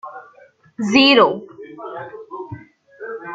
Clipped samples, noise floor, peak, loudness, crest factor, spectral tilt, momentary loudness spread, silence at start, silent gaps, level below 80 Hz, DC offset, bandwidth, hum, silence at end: under 0.1%; -50 dBFS; 0 dBFS; -14 LUFS; 20 dB; -4 dB/octave; 25 LU; 0.05 s; none; -62 dBFS; under 0.1%; 7.8 kHz; none; 0 s